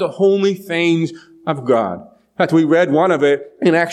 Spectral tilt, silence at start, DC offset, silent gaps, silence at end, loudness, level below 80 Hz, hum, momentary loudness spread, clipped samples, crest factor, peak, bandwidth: -6.5 dB/octave; 0 s; under 0.1%; none; 0 s; -16 LUFS; -66 dBFS; none; 11 LU; under 0.1%; 14 dB; -2 dBFS; 13.5 kHz